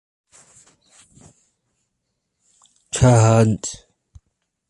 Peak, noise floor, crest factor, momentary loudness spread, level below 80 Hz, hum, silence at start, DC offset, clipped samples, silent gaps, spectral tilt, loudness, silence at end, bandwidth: -2 dBFS; -75 dBFS; 20 dB; 17 LU; -44 dBFS; none; 2.95 s; under 0.1%; under 0.1%; none; -6 dB/octave; -17 LUFS; 0.95 s; 11.5 kHz